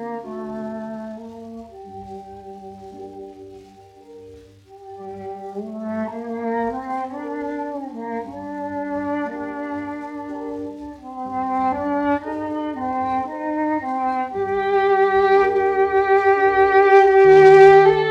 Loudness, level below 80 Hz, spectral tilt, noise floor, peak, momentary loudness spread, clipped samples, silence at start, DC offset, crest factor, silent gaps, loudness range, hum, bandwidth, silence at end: -18 LUFS; -54 dBFS; -6.5 dB/octave; -45 dBFS; -2 dBFS; 24 LU; under 0.1%; 0 s; under 0.1%; 18 dB; none; 22 LU; none; 6.8 kHz; 0 s